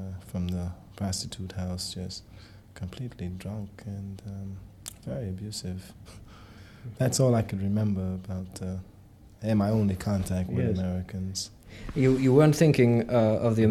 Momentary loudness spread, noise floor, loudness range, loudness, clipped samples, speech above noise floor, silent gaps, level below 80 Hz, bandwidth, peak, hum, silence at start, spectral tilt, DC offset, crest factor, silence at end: 20 LU; -51 dBFS; 14 LU; -28 LUFS; under 0.1%; 24 dB; none; -50 dBFS; 15.5 kHz; -8 dBFS; none; 0 s; -6.5 dB/octave; under 0.1%; 20 dB; 0 s